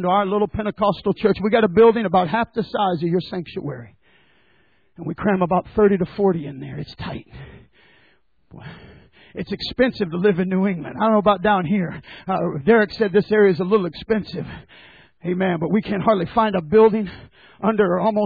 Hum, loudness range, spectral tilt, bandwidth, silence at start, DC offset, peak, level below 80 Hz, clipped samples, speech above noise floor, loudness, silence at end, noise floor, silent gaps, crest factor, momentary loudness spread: none; 7 LU; -9 dB/octave; 4.9 kHz; 0 s; under 0.1%; -4 dBFS; -48 dBFS; under 0.1%; 42 dB; -19 LUFS; 0 s; -61 dBFS; none; 16 dB; 16 LU